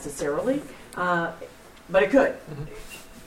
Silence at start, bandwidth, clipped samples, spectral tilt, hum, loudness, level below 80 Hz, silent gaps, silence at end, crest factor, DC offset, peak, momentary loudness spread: 0 s; 16 kHz; under 0.1%; -5 dB/octave; none; -24 LUFS; -50 dBFS; none; 0 s; 20 dB; under 0.1%; -6 dBFS; 21 LU